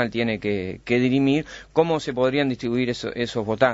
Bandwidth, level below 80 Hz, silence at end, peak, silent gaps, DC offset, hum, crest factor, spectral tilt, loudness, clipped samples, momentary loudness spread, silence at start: 8 kHz; -52 dBFS; 0 s; -4 dBFS; none; under 0.1%; none; 18 dB; -6.5 dB/octave; -23 LUFS; under 0.1%; 6 LU; 0 s